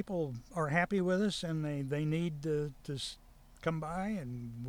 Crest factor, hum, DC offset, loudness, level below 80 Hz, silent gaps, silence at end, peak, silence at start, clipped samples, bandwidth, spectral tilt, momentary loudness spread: 20 dB; none; under 0.1%; -36 LUFS; -58 dBFS; none; 0 s; -16 dBFS; 0 s; under 0.1%; 16 kHz; -6 dB/octave; 9 LU